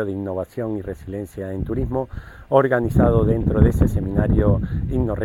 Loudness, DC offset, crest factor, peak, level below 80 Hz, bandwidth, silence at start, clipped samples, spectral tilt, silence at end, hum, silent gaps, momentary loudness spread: -21 LUFS; under 0.1%; 20 dB; 0 dBFS; -28 dBFS; 15 kHz; 0 s; under 0.1%; -9.5 dB/octave; 0 s; none; none; 13 LU